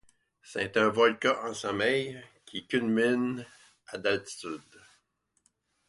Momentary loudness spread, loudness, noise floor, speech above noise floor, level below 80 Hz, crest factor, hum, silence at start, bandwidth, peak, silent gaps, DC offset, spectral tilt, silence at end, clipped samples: 17 LU; -29 LUFS; -75 dBFS; 46 dB; -68 dBFS; 22 dB; none; 0.45 s; 11.5 kHz; -10 dBFS; none; under 0.1%; -4.5 dB/octave; 1.3 s; under 0.1%